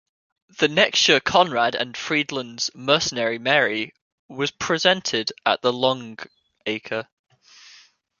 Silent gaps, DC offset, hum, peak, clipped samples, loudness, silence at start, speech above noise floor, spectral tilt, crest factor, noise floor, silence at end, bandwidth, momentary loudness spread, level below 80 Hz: 4.02-4.29 s; under 0.1%; none; -2 dBFS; under 0.1%; -21 LUFS; 0.6 s; 31 dB; -2.5 dB/octave; 22 dB; -53 dBFS; 1.15 s; 7.4 kHz; 14 LU; -62 dBFS